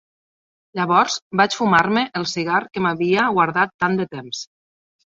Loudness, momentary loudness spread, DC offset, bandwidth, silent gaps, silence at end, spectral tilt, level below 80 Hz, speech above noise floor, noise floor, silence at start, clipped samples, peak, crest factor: -19 LUFS; 13 LU; under 0.1%; 8 kHz; 1.22-1.31 s, 3.74-3.79 s; 0.6 s; -4.5 dB/octave; -60 dBFS; over 71 dB; under -90 dBFS; 0.75 s; under 0.1%; -2 dBFS; 18 dB